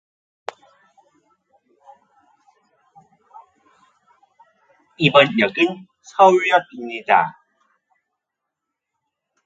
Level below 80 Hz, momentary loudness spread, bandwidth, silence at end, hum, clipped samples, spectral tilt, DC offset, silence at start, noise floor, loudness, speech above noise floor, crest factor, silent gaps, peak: -66 dBFS; 23 LU; 8 kHz; 2.15 s; none; under 0.1%; -5.5 dB/octave; under 0.1%; 5 s; -82 dBFS; -17 LUFS; 66 dB; 22 dB; none; 0 dBFS